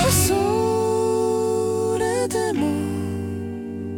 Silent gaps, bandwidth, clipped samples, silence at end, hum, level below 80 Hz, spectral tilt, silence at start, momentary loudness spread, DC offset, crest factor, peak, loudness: none; 18 kHz; under 0.1%; 0 s; none; -46 dBFS; -5 dB/octave; 0 s; 10 LU; under 0.1%; 18 dB; -4 dBFS; -22 LUFS